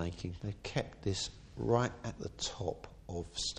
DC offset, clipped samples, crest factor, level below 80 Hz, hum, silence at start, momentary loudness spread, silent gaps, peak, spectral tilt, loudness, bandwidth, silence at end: under 0.1%; under 0.1%; 22 dB; -54 dBFS; none; 0 s; 11 LU; none; -16 dBFS; -4.5 dB/octave; -38 LUFS; 10.5 kHz; 0 s